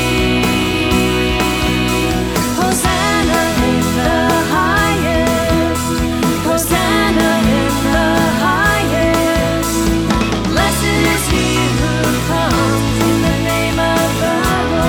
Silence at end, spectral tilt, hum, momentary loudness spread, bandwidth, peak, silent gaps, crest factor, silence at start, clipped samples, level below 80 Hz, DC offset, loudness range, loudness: 0 s; -4.5 dB/octave; none; 2 LU; over 20 kHz; 0 dBFS; none; 14 dB; 0 s; under 0.1%; -26 dBFS; under 0.1%; 1 LU; -14 LUFS